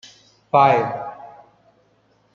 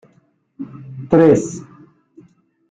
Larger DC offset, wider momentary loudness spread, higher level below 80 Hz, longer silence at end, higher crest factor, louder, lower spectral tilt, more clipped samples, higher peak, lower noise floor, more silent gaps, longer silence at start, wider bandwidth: neither; second, 20 LU vs 23 LU; second, -66 dBFS vs -52 dBFS; about the same, 1.05 s vs 1.1 s; about the same, 20 dB vs 18 dB; second, -18 LUFS vs -14 LUFS; about the same, -6.5 dB/octave vs -7.5 dB/octave; neither; about the same, -2 dBFS vs -2 dBFS; about the same, -60 dBFS vs -58 dBFS; neither; about the same, 0.55 s vs 0.6 s; second, 7.2 kHz vs 9.2 kHz